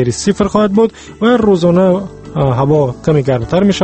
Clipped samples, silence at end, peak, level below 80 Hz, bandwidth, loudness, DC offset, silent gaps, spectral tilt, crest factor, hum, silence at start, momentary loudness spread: under 0.1%; 0 s; 0 dBFS; -38 dBFS; 8.8 kHz; -12 LUFS; under 0.1%; none; -6.5 dB/octave; 12 dB; none; 0 s; 6 LU